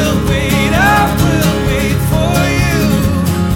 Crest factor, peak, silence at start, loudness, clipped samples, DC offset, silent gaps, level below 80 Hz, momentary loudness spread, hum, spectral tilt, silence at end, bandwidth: 10 dB; 0 dBFS; 0 s; -12 LUFS; under 0.1%; under 0.1%; none; -22 dBFS; 4 LU; none; -5.5 dB/octave; 0 s; 17 kHz